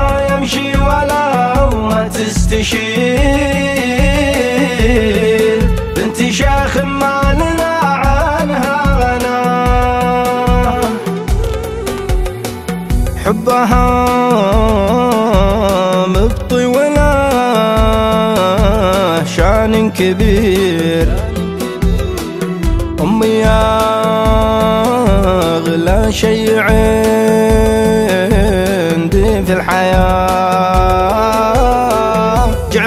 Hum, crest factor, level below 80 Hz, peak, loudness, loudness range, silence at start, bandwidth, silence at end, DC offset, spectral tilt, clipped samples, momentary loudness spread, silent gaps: none; 12 dB; -18 dBFS; 0 dBFS; -12 LUFS; 3 LU; 0 s; 16 kHz; 0 s; under 0.1%; -5.5 dB/octave; under 0.1%; 6 LU; none